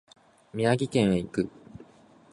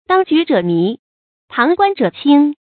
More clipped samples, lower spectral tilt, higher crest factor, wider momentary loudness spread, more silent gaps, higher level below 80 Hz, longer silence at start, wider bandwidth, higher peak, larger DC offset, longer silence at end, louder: neither; second, -6.5 dB/octave vs -9.5 dB/octave; first, 20 dB vs 14 dB; about the same, 10 LU vs 8 LU; second, none vs 0.99-1.48 s; first, -56 dBFS vs -62 dBFS; first, 0.55 s vs 0.1 s; first, 11.5 kHz vs 4.6 kHz; second, -8 dBFS vs 0 dBFS; neither; first, 0.55 s vs 0.2 s; second, -27 LUFS vs -14 LUFS